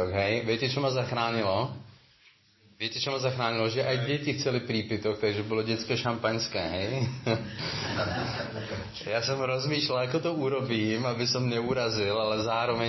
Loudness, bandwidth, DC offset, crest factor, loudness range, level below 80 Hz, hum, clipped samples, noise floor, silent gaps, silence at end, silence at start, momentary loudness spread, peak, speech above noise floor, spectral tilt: -29 LUFS; 6.2 kHz; under 0.1%; 18 dB; 3 LU; -56 dBFS; none; under 0.1%; -61 dBFS; none; 0 s; 0 s; 5 LU; -12 dBFS; 32 dB; -5 dB/octave